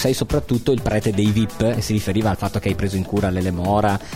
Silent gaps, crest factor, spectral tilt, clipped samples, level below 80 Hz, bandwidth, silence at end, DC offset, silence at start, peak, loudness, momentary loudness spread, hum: none; 14 dB; -6 dB/octave; under 0.1%; -36 dBFS; 16.5 kHz; 0 s; under 0.1%; 0 s; -6 dBFS; -20 LUFS; 3 LU; none